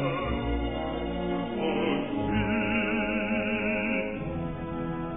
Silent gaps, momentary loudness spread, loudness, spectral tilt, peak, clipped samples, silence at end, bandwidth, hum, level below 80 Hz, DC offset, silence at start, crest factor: none; 7 LU; -29 LUFS; -10 dB/octave; -14 dBFS; under 0.1%; 0 s; 3.9 kHz; none; -42 dBFS; 0.3%; 0 s; 14 dB